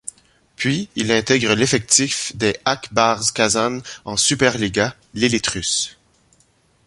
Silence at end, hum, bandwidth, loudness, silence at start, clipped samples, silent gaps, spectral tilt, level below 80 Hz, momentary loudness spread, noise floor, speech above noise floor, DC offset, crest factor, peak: 0.95 s; none; 11.5 kHz; -18 LUFS; 0.05 s; under 0.1%; none; -3 dB/octave; -48 dBFS; 8 LU; -59 dBFS; 40 dB; under 0.1%; 20 dB; 0 dBFS